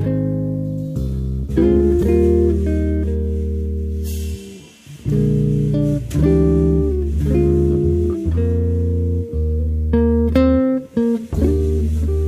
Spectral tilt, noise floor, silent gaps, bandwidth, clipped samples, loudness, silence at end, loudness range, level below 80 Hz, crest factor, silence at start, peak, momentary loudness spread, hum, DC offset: -9.5 dB/octave; -39 dBFS; none; 13 kHz; under 0.1%; -18 LUFS; 0 s; 4 LU; -22 dBFS; 14 dB; 0 s; -2 dBFS; 9 LU; none; under 0.1%